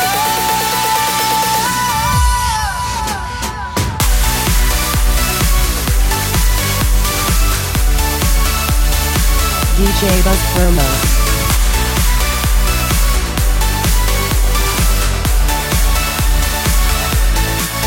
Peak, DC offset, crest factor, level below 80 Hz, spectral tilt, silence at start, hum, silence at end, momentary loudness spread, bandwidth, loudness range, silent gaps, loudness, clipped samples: 0 dBFS; under 0.1%; 12 dB; -16 dBFS; -3.5 dB/octave; 0 s; none; 0 s; 2 LU; 17 kHz; 2 LU; none; -14 LUFS; under 0.1%